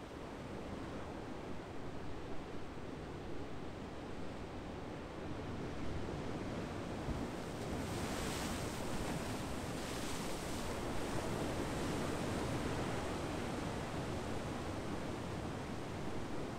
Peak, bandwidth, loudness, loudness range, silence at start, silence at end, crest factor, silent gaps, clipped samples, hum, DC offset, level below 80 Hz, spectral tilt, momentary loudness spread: -26 dBFS; 16 kHz; -43 LUFS; 7 LU; 0 s; 0 s; 16 dB; none; under 0.1%; none; under 0.1%; -54 dBFS; -5 dB/octave; 8 LU